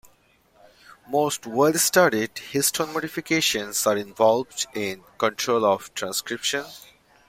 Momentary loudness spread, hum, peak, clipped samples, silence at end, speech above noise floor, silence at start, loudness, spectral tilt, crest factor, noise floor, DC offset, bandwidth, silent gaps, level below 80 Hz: 9 LU; none; -4 dBFS; under 0.1%; 0.5 s; 37 dB; 0.9 s; -23 LUFS; -2.5 dB/octave; 20 dB; -60 dBFS; under 0.1%; 16.5 kHz; none; -64 dBFS